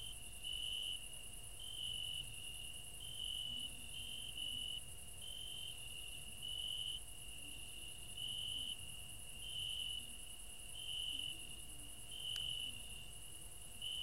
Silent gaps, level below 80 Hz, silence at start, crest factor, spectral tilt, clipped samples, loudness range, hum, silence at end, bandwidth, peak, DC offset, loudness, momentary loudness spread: none; -60 dBFS; 0 s; 22 dB; -0.5 dB/octave; under 0.1%; 1 LU; none; 0 s; 16 kHz; -26 dBFS; 0.2%; -45 LUFS; 9 LU